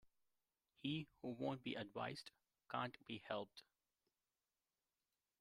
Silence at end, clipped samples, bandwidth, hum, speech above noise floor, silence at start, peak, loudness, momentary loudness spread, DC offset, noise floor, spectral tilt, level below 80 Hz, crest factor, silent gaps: 1.8 s; under 0.1%; 15.5 kHz; none; over 42 dB; 0.05 s; -28 dBFS; -49 LUFS; 9 LU; under 0.1%; under -90 dBFS; -6 dB/octave; -86 dBFS; 22 dB; none